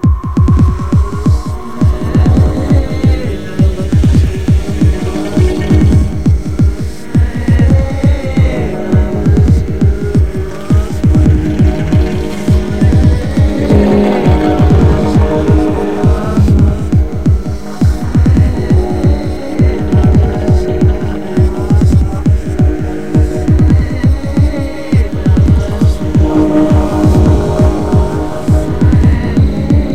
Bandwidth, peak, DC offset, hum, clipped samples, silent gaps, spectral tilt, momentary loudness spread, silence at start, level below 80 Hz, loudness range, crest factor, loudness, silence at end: 10 kHz; 0 dBFS; 7%; none; 0.1%; none; -8.5 dB/octave; 5 LU; 0 s; -16 dBFS; 2 LU; 10 dB; -11 LUFS; 0 s